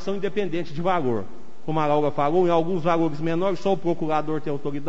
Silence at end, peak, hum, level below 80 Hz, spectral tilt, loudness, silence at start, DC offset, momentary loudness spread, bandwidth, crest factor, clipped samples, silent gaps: 0 s; -8 dBFS; none; -56 dBFS; -7.5 dB/octave; -24 LUFS; 0 s; 5%; 7 LU; 8 kHz; 16 dB; under 0.1%; none